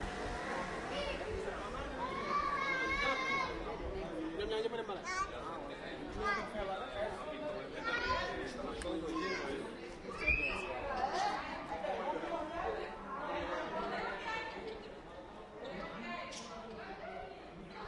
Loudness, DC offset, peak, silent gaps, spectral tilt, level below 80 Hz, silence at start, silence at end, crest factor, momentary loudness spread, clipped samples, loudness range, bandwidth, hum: -39 LUFS; under 0.1%; -20 dBFS; none; -4 dB/octave; -54 dBFS; 0 s; 0 s; 20 dB; 12 LU; under 0.1%; 5 LU; 11.5 kHz; none